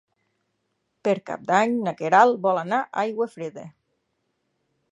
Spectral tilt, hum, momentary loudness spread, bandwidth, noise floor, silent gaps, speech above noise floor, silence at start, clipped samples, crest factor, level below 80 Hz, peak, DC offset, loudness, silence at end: -5.5 dB/octave; none; 13 LU; 11 kHz; -75 dBFS; none; 53 dB; 1.05 s; under 0.1%; 22 dB; -76 dBFS; -4 dBFS; under 0.1%; -22 LUFS; 1.25 s